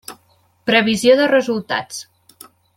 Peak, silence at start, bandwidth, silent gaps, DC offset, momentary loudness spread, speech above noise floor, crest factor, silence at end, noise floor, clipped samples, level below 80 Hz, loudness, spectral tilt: -2 dBFS; 0.1 s; 16 kHz; none; under 0.1%; 18 LU; 42 dB; 16 dB; 0.75 s; -58 dBFS; under 0.1%; -60 dBFS; -16 LUFS; -3.5 dB/octave